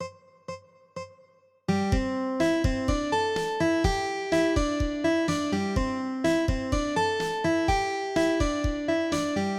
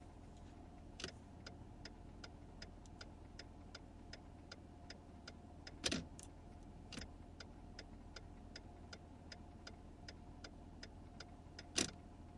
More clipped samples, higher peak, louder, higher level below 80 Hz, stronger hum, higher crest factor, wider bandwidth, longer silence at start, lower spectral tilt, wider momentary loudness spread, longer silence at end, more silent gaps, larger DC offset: neither; first, -8 dBFS vs -20 dBFS; first, -26 LUFS vs -52 LUFS; first, -36 dBFS vs -62 dBFS; neither; second, 18 dB vs 34 dB; first, 14 kHz vs 11 kHz; about the same, 0 s vs 0 s; first, -5.5 dB/octave vs -3 dB/octave; first, 17 LU vs 14 LU; about the same, 0 s vs 0 s; neither; neither